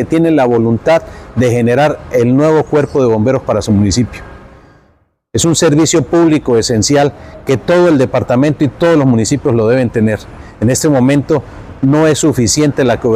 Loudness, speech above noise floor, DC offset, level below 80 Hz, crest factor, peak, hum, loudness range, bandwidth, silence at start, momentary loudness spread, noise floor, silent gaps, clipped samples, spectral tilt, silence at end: -11 LUFS; 43 dB; under 0.1%; -38 dBFS; 10 dB; -2 dBFS; none; 2 LU; 15 kHz; 0 s; 7 LU; -54 dBFS; none; under 0.1%; -5.5 dB/octave; 0 s